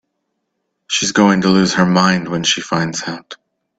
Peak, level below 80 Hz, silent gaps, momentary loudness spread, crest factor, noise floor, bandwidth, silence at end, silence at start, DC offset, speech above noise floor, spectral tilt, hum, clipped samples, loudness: 0 dBFS; -52 dBFS; none; 10 LU; 16 dB; -72 dBFS; 8.8 kHz; 0.45 s; 0.9 s; under 0.1%; 57 dB; -4 dB/octave; none; under 0.1%; -14 LUFS